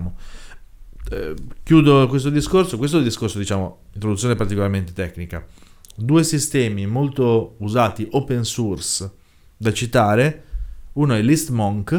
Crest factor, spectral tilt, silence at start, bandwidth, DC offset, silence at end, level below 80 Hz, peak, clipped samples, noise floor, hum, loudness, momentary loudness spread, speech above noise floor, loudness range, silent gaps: 18 dB; -5.5 dB/octave; 0 s; 17.5 kHz; under 0.1%; 0 s; -38 dBFS; 0 dBFS; under 0.1%; -39 dBFS; none; -19 LUFS; 16 LU; 20 dB; 4 LU; none